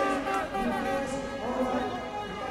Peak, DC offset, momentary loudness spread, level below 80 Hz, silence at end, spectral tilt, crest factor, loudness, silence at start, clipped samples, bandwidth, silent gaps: -14 dBFS; under 0.1%; 6 LU; -50 dBFS; 0 s; -5 dB/octave; 16 dB; -31 LUFS; 0 s; under 0.1%; 16 kHz; none